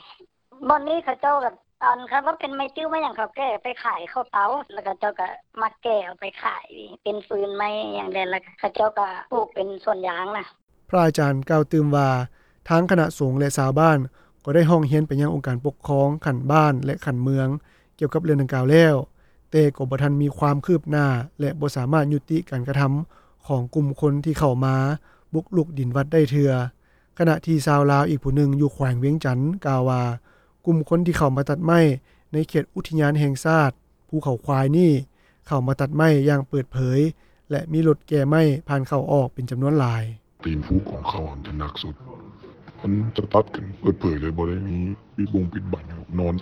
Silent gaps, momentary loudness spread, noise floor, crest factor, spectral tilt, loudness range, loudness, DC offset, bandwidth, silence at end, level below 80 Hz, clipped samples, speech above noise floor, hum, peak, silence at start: 10.63-10.67 s; 12 LU; -52 dBFS; 18 dB; -7.5 dB/octave; 6 LU; -22 LUFS; under 0.1%; 14.5 kHz; 0 s; -46 dBFS; under 0.1%; 30 dB; none; -2 dBFS; 0.1 s